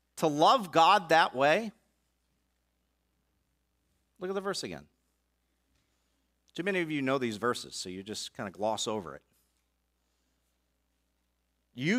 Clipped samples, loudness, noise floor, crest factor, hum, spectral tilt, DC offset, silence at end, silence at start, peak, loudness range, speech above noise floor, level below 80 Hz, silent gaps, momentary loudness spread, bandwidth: under 0.1%; -29 LUFS; -77 dBFS; 22 dB; 60 Hz at -70 dBFS; -4 dB/octave; under 0.1%; 0 s; 0.15 s; -10 dBFS; 14 LU; 48 dB; -74 dBFS; none; 17 LU; 16 kHz